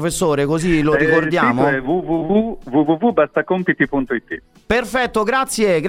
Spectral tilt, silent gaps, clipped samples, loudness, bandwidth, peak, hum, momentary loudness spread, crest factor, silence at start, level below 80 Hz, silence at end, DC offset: -5.5 dB/octave; none; under 0.1%; -17 LUFS; 16 kHz; 0 dBFS; none; 5 LU; 16 dB; 0 s; -40 dBFS; 0 s; under 0.1%